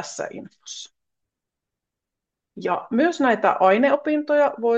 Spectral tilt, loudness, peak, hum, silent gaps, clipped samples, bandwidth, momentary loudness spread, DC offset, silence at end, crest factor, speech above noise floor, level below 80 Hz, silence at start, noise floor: -4.5 dB/octave; -20 LUFS; -4 dBFS; none; none; under 0.1%; 8.4 kHz; 19 LU; under 0.1%; 0 s; 18 dB; 64 dB; -76 dBFS; 0 s; -85 dBFS